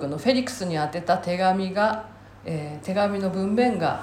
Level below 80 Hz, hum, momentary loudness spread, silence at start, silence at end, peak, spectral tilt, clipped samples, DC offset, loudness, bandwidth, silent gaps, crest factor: -58 dBFS; none; 10 LU; 0 s; 0 s; -8 dBFS; -6 dB/octave; under 0.1%; under 0.1%; -24 LUFS; 15 kHz; none; 16 dB